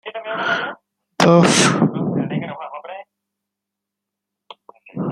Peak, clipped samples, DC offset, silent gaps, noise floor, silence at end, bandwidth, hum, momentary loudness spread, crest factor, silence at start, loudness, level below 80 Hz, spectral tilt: -2 dBFS; under 0.1%; under 0.1%; none; -83 dBFS; 0 s; 13 kHz; none; 21 LU; 18 dB; 0.05 s; -17 LUFS; -60 dBFS; -4.5 dB/octave